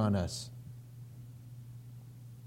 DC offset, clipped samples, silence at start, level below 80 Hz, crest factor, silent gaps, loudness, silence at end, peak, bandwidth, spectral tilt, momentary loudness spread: under 0.1%; under 0.1%; 0 s; -60 dBFS; 20 dB; none; -42 LUFS; 0 s; -18 dBFS; 16.5 kHz; -6 dB/octave; 17 LU